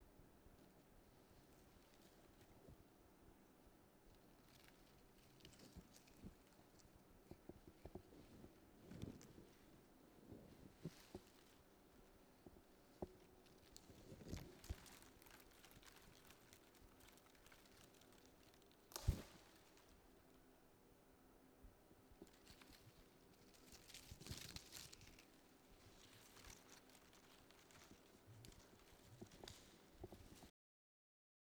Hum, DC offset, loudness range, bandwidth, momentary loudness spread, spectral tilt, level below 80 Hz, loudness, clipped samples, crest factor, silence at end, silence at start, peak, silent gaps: none; under 0.1%; 12 LU; over 20 kHz; 13 LU; -4.5 dB/octave; -68 dBFS; -62 LUFS; under 0.1%; 34 dB; 0.95 s; 0 s; -26 dBFS; none